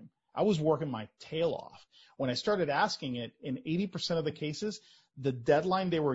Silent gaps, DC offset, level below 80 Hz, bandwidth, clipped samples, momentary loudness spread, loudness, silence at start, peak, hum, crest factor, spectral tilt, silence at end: none; under 0.1%; -68 dBFS; 8 kHz; under 0.1%; 11 LU; -32 LUFS; 0 s; -14 dBFS; none; 18 dB; -6 dB/octave; 0 s